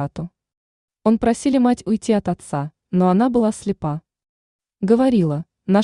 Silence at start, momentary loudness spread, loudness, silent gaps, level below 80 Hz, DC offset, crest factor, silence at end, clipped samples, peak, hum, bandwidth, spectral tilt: 0 s; 11 LU; -19 LUFS; 0.57-0.88 s, 4.29-4.59 s; -50 dBFS; under 0.1%; 16 dB; 0 s; under 0.1%; -4 dBFS; none; 11 kHz; -7.5 dB/octave